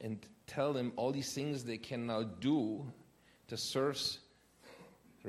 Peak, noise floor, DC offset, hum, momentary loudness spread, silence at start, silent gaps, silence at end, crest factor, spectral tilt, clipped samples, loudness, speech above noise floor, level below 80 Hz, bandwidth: -22 dBFS; -61 dBFS; under 0.1%; none; 13 LU; 0 s; none; 0 s; 18 dB; -5 dB/octave; under 0.1%; -38 LUFS; 24 dB; -74 dBFS; 14.5 kHz